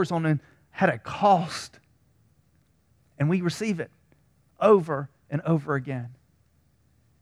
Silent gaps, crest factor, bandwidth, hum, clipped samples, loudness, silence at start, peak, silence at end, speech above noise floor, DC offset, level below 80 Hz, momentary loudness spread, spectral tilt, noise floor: none; 22 dB; 13 kHz; none; under 0.1%; -25 LUFS; 0 s; -6 dBFS; 1.05 s; 41 dB; under 0.1%; -64 dBFS; 15 LU; -7 dB/octave; -65 dBFS